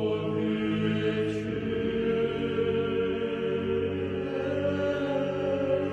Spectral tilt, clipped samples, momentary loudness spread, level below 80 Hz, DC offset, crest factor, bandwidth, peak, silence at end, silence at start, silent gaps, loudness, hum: -7.5 dB/octave; under 0.1%; 3 LU; -54 dBFS; under 0.1%; 12 dB; 8.8 kHz; -16 dBFS; 0 s; 0 s; none; -29 LUFS; none